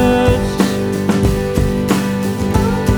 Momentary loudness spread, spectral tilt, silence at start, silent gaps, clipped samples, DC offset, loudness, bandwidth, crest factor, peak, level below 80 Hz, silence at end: 3 LU; -6.5 dB/octave; 0 s; none; under 0.1%; under 0.1%; -16 LUFS; over 20 kHz; 14 dB; 0 dBFS; -24 dBFS; 0 s